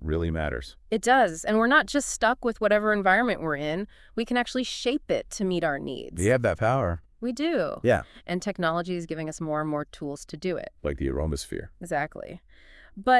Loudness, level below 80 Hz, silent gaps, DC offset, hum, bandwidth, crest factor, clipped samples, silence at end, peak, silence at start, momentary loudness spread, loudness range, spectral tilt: -26 LUFS; -46 dBFS; none; under 0.1%; none; 12 kHz; 18 dB; under 0.1%; 0 s; -8 dBFS; 0 s; 12 LU; 8 LU; -5 dB/octave